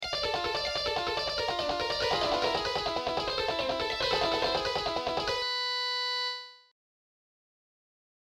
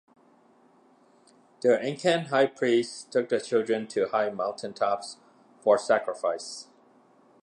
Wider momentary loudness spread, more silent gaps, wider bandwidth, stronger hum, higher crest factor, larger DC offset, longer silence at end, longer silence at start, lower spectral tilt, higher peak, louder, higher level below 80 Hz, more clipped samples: second, 3 LU vs 9 LU; neither; first, 16.5 kHz vs 11 kHz; neither; about the same, 16 dB vs 18 dB; neither; first, 1.7 s vs 0.8 s; second, 0 s vs 1.65 s; second, -2.5 dB/octave vs -4.5 dB/octave; second, -16 dBFS vs -10 dBFS; second, -30 LUFS vs -27 LUFS; first, -54 dBFS vs -80 dBFS; neither